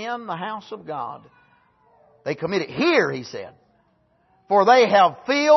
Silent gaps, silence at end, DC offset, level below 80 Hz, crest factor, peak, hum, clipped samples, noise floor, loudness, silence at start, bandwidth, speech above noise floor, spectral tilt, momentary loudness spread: none; 0 s; under 0.1%; -68 dBFS; 18 dB; -4 dBFS; none; under 0.1%; -63 dBFS; -20 LUFS; 0 s; 6.2 kHz; 43 dB; -4.5 dB/octave; 20 LU